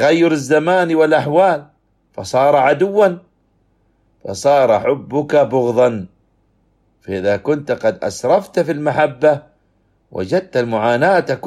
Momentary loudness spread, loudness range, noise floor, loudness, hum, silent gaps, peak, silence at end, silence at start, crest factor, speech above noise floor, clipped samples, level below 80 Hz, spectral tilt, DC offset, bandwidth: 14 LU; 3 LU; -60 dBFS; -15 LUFS; none; none; -2 dBFS; 0 s; 0 s; 14 dB; 45 dB; under 0.1%; -58 dBFS; -6 dB/octave; under 0.1%; 12.5 kHz